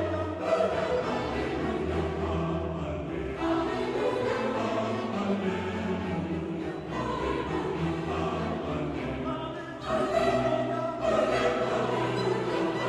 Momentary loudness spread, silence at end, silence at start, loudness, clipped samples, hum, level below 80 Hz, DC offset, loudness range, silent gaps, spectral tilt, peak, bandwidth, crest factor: 7 LU; 0 s; 0 s; -30 LUFS; under 0.1%; none; -46 dBFS; under 0.1%; 3 LU; none; -6.5 dB/octave; -14 dBFS; 12 kHz; 16 dB